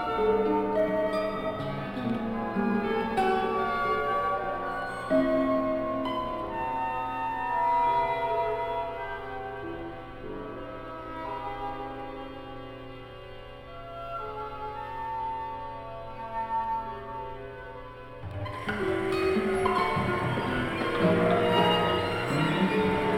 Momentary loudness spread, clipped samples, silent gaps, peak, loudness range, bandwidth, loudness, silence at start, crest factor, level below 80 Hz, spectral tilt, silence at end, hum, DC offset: 16 LU; under 0.1%; none; -12 dBFS; 12 LU; 16.5 kHz; -29 LUFS; 0 s; 18 dB; -48 dBFS; -6.5 dB/octave; 0 s; none; under 0.1%